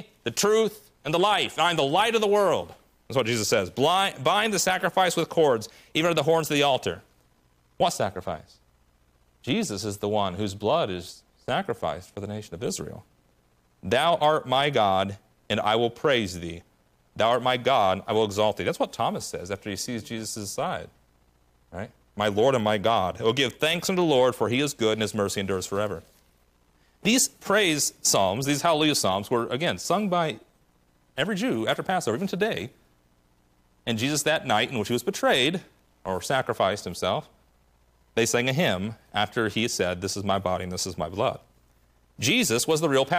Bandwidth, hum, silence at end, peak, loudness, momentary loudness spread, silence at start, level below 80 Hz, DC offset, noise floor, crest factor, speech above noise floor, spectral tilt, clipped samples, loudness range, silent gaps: 15.5 kHz; none; 0 s; -10 dBFS; -25 LUFS; 12 LU; 0 s; -62 dBFS; under 0.1%; -64 dBFS; 16 dB; 39 dB; -3.5 dB/octave; under 0.1%; 6 LU; none